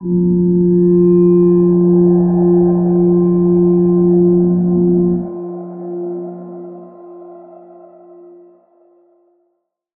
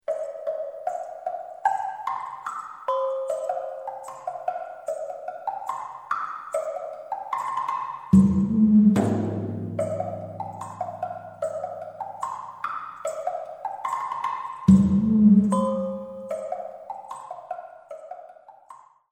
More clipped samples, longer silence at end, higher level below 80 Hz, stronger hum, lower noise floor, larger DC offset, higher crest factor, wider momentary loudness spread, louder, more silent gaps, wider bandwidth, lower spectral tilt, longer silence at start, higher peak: neither; first, 2.55 s vs 0.35 s; first, -44 dBFS vs -52 dBFS; neither; first, -68 dBFS vs -50 dBFS; neither; second, 10 dB vs 20 dB; about the same, 16 LU vs 18 LU; first, -12 LUFS vs -26 LUFS; neither; second, 1.8 kHz vs 9.8 kHz; first, -16 dB/octave vs -8.5 dB/octave; about the same, 0 s vs 0.1 s; about the same, -2 dBFS vs -4 dBFS